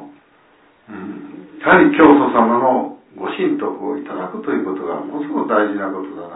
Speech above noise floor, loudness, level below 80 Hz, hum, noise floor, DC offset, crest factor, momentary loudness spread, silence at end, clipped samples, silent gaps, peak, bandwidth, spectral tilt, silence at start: 37 dB; -16 LUFS; -56 dBFS; none; -52 dBFS; under 0.1%; 18 dB; 21 LU; 0 s; under 0.1%; none; 0 dBFS; 4 kHz; -10.5 dB/octave; 0 s